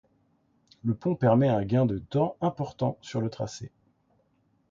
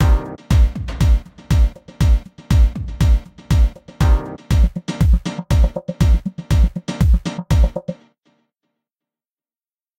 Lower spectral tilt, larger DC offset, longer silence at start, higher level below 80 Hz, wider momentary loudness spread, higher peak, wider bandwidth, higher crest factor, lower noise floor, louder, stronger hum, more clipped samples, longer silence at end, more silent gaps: about the same, -8 dB/octave vs -7 dB/octave; neither; first, 0.85 s vs 0 s; second, -58 dBFS vs -18 dBFS; first, 13 LU vs 4 LU; second, -10 dBFS vs -4 dBFS; second, 7.6 kHz vs 15 kHz; about the same, 18 dB vs 14 dB; second, -69 dBFS vs under -90 dBFS; second, -27 LUFS vs -18 LUFS; neither; neither; second, 1.05 s vs 2.05 s; neither